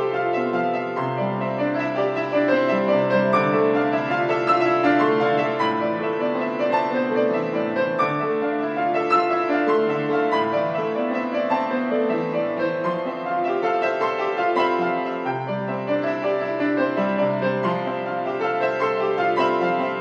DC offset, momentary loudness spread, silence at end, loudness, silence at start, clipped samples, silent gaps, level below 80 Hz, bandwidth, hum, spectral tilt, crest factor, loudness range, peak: under 0.1%; 5 LU; 0 s; -22 LUFS; 0 s; under 0.1%; none; -70 dBFS; 7.6 kHz; none; -7.5 dB/octave; 16 dB; 3 LU; -6 dBFS